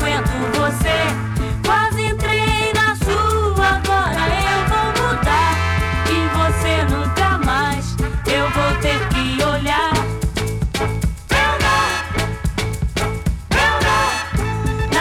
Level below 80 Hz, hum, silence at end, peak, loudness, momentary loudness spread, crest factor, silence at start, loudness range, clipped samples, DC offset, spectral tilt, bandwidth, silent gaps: -26 dBFS; none; 0 s; -8 dBFS; -18 LUFS; 6 LU; 10 dB; 0 s; 2 LU; under 0.1%; under 0.1%; -4.5 dB/octave; 18 kHz; none